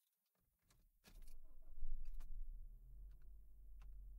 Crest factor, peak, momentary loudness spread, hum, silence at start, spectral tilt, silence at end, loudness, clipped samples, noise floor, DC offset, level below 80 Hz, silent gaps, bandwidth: 16 dB; -32 dBFS; 11 LU; none; 1.05 s; -5.5 dB/octave; 0 s; -61 LUFS; under 0.1%; -86 dBFS; under 0.1%; -52 dBFS; none; 4.5 kHz